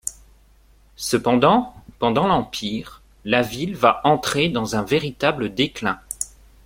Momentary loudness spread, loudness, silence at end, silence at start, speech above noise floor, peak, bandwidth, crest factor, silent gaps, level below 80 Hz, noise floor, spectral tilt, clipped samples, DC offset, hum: 13 LU; -21 LUFS; 0.4 s; 0.05 s; 33 dB; -2 dBFS; 16.5 kHz; 20 dB; none; -48 dBFS; -53 dBFS; -4.5 dB/octave; under 0.1%; under 0.1%; none